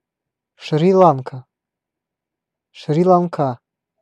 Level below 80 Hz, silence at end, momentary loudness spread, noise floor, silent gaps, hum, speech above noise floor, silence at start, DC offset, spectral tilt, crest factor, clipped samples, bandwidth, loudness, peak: -68 dBFS; 0.45 s; 22 LU; -83 dBFS; none; none; 68 dB; 0.6 s; under 0.1%; -8.5 dB/octave; 18 dB; under 0.1%; 8.6 kHz; -16 LUFS; 0 dBFS